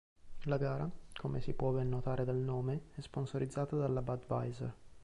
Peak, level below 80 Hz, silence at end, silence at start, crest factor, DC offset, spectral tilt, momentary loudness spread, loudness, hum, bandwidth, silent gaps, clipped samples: -24 dBFS; -54 dBFS; 0 s; 0.25 s; 14 dB; under 0.1%; -8.5 dB/octave; 8 LU; -38 LUFS; none; 11 kHz; none; under 0.1%